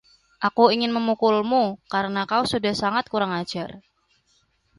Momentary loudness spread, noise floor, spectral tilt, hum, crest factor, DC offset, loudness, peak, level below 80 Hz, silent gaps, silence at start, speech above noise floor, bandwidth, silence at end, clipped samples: 9 LU; -66 dBFS; -5 dB/octave; none; 20 dB; under 0.1%; -22 LUFS; -2 dBFS; -60 dBFS; none; 0.4 s; 44 dB; 11.5 kHz; 1 s; under 0.1%